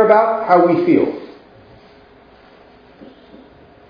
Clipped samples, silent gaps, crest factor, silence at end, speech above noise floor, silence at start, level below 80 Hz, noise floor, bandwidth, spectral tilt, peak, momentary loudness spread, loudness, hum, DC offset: under 0.1%; none; 18 dB; 2.65 s; 33 dB; 0 s; -58 dBFS; -46 dBFS; 5.2 kHz; -9 dB/octave; 0 dBFS; 18 LU; -14 LUFS; none; under 0.1%